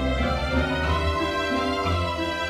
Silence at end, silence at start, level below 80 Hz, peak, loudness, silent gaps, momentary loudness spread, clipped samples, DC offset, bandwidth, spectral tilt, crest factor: 0 s; 0 s; -32 dBFS; -10 dBFS; -24 LUFS; none; 1 LU; under 0.1%; under 0.1%; 14 kHz; -5.5 dB/octave; 14 dB